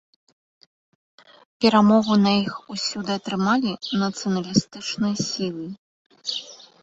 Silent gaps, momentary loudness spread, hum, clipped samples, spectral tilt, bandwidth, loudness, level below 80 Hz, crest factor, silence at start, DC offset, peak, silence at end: 5.78-6.10 s; 14 LU; none; under 0.1%; -5 dB/octave; 8 kHz; -22 LUFS; -60 dBFS; 20 dB; 1.6 s; under 0.1%; -4 dBFS; 0.25 s